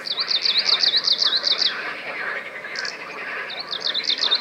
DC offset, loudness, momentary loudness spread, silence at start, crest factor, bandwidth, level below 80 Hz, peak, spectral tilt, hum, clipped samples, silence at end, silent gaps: under 0.1%; -20 LUFS; 13 LU; 0 s; 18 dB; 16.5 kHz; -76 dBFS; -6 dBFS; 0.5 dB/octave; none; under 0.1%; 0 s; none